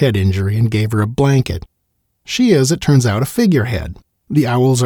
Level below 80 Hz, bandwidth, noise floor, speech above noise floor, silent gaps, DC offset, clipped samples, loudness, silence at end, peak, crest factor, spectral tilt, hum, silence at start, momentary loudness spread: -40 dBFS; 19.5 kHz; -67 dBFS; 54 dB; none; under 0.1%; under 0.1%; -15 LUFS; 0 s; -2 dBFS; 14 dB; -6 dB/octave; none; 0 s; 10 LU